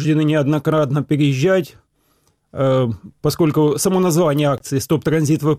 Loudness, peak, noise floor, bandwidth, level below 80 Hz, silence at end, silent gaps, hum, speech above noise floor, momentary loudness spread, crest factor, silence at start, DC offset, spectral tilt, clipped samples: -17 LUFS; -8 dBFS; -62 dBFS; 15.5 kHz; -52 dBFS; 0 s; none; none; 45 dB; 6 LU; 10 dB; 0 s; under 0.1%; -6.5 dB/octave; under 0.1%